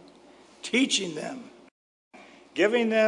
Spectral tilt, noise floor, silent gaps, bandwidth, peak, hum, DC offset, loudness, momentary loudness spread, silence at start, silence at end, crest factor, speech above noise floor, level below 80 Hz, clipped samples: -3 dB/octave; -54 dBFS; 1.71-2.11 s; 11 kHz; -10 dBFS; none; under 0.1%; -26 LUFS; 16 LU; 0.65 s; 0 s; 18 dB; 29 dB; -76 dBFS; under 0.1%